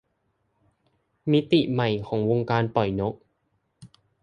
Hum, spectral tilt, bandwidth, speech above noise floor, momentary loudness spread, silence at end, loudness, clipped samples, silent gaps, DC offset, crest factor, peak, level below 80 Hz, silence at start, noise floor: none; -8.5 dB/octave; 9.6 kHz; 50 dB; 10 LU; 0.35 s; -24 LUFS; under 0.1%; none; under 0.1%; 20 dB; -6 dBFS; -56 dBFS; 1.25 s; -73 dBFS